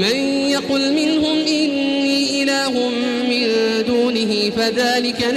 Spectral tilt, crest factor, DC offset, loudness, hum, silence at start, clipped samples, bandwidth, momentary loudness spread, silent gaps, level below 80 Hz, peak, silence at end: -3.5 dB/octave; 12 dB; under 0.1%; -17 LUFS; none; 0 s; under 0.1%; 14 kHz; 2 LU; none; -54 dBFS; -6 dBFS; 0 s